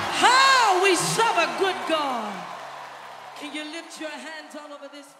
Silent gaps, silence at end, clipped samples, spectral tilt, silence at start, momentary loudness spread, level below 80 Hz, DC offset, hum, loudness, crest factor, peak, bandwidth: none; 0.15 s; under 0.1%; -2 dB/octave; 0 s; 23 LU; -70 dBFS; under 0.1%; none; -20 LUFS; 20 dB; -4 dBFS; 16 kHz